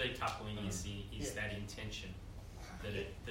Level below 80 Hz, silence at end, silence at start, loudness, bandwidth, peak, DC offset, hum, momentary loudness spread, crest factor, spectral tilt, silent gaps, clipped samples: -52 dBFS; 0 s; 0 s; -43 LUFS; 16 kHz; -22 dBFS; under 0.1%; none; 11 LU; 20 dB; -4 dB/octave; none; under 0.1%